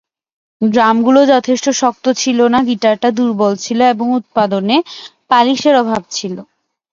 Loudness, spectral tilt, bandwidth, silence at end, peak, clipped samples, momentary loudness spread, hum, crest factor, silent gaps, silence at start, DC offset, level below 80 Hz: -13 LUFS; -4 dB/octave; 7.6 kHz; 0.5 s; 0 dBFS; under 0.1%; 9 LU; none; 14 dB; none; 0.6 s; under 0.1%; -58 dBFS